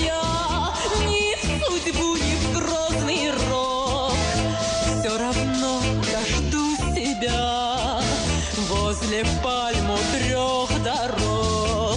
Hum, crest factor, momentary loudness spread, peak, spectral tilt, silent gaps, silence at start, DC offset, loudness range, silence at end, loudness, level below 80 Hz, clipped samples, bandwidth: none; 12 dB; 1 LU; -10 dBFS; -4 dB/octave; none; 0 s; under 0.1%; 1 LU; 0 s; -23 LUFS; -32 dBFS; under 0.1%; 11 kHz